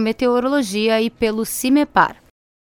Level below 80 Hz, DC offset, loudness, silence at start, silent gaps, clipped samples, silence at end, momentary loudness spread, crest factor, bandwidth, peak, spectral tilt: -50 dBFS; under 0.1%; -18 LUFS; 0 s; none; under 0.1%; 0.55 s; 4 LU; 18 dB; 19 kHz; 0 dBFS; -4 dB/octave